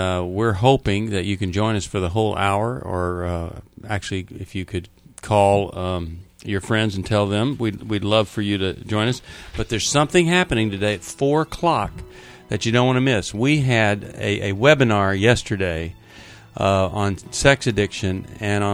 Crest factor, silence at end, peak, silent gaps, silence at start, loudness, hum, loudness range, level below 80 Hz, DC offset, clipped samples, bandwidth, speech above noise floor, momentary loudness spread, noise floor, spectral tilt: 20 dB; 0 s; 0 dBFS; none; 0 s; -20 LUFS; none; 5 LU; -42 dBFS; under 0.1%; under 0.1%; 14.5 kHz; 23 dB; 13 LU; -43 dBFS; -5 dB/octave